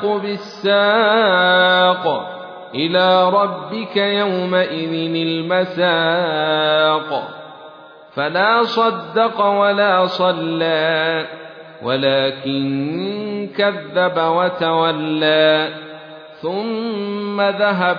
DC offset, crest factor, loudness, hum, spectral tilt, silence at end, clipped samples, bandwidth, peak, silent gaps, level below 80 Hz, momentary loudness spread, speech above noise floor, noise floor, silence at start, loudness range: under 0.1%; 16 dB; -17 LUFS; none; -6.5 dB/octave; 0 s; under 0.1%; 5.4 kHz; -2 dBFS; none; -68 dBFS; 12 LU; 23 dB; -40 dBFS; 0 s; 4 LU